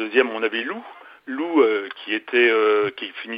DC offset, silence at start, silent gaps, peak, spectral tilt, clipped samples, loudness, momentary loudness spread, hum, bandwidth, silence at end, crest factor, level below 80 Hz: under 0.1%; 0 s; none; -2 dBFS; -6.5 dB/octave; under 0.1%; -21 LUFS; 15 LU; none; 5.2 kHz; 0 s; 18 dB; -78 dBFS